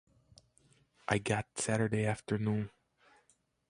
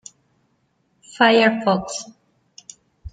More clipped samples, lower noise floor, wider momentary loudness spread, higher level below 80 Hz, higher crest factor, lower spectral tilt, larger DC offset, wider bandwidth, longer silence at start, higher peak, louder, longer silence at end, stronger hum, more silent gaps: neither; first, -73 dBFS vs -66 dBFS; second, 7 LU vs 17 LU; second, -62 dBFS vs -52 dBFS; about the same, 24 dB vs 20 dB; first, -5.5 dB/octave vs -4 dB/octave; neither; first, 11.5 kHz vs 9.4 kHz; about the same, 1.1 s vs 1.15 s; second, -12 dBFS vs -2 dBFS; second, -34 LUFS vs -18 LUFS; first, 1 s vs 0.05 s; neither; neither